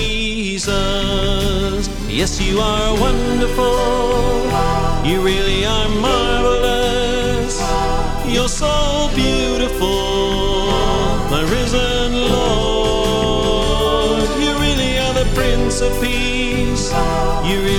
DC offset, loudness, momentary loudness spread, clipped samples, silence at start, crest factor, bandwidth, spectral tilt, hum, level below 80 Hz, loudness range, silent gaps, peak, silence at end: under 0.1%; -17 LUFS; 3 LU; under 0.1%; 0 s; 14 dB; 17 kHz; -4.5 dB/octave; none; -22 dBFS; 1 LU; none; -2 dBFS; 0 s